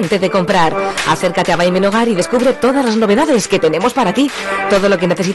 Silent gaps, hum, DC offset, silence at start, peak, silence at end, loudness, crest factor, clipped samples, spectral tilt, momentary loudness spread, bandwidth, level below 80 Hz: none; none; under 0.1%; 0 s; -4 dBFS; 0 s; -13 LUFS; 10 dB; under 0.1%; -5 dB/octave; 2 LU; 12.5 kHz; -44 dBFS